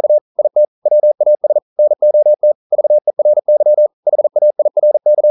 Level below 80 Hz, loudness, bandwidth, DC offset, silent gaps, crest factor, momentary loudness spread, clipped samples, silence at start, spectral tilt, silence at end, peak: -80 dBFS; -12 LUFS; 1.1 kHz; under 0.1%; 0.21-0.35 s, 0.68-0.82 s, 1.62-1.76 s, 2.55-2.70 s, 3.93-4.03 s; 6 dB; 4 LU; under 0.1%; 0 s; -11.5 dB/octave; 0 s; -4 dBFS